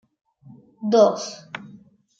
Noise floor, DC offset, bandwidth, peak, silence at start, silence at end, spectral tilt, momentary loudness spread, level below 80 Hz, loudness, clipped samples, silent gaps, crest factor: -50 dBFS; under 0.1%; 7.8 kHz; -4 dBFS; 0.8 s; 0.55 s; -5 dB/octave; 21 LU; -74 dBFS; -20 LUFS; under 0.1%; none; 20 dB